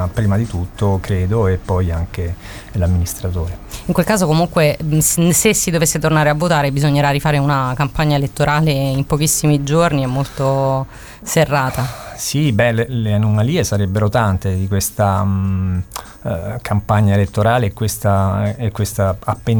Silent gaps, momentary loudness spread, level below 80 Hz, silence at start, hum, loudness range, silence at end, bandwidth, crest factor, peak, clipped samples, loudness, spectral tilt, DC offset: none; 9 LU; -34 dBFS; 0 s; none; 4 LU; 0 s; 19 kHz; 16 dB; 0 dBFS; under 0.1%; -16 LUFS; -5.5 dB/octave; 0.1%